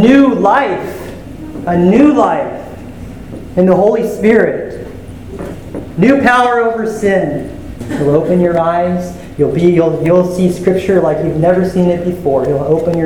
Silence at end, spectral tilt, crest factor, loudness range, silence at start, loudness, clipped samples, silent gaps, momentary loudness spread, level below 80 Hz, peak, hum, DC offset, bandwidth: 0 s; -7.5 dB/octave; 12 dB; 2 LU; 0 s; -12 LUFS; 0.4%; none; 18 LU; -36 dBFS; 0 dBFS; none; under 0.1%; 17.5 kHz